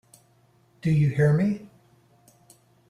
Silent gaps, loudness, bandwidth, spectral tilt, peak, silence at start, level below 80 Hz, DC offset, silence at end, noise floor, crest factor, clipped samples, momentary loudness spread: none; -24 LUFS; 10 kHz; -9 dB/octave; -10 dBFS; 0.85 s; -58 dBFS; under 0.1%; 1.25 s; -61 dBFS; 16 dB; under 0.1%; 11 LU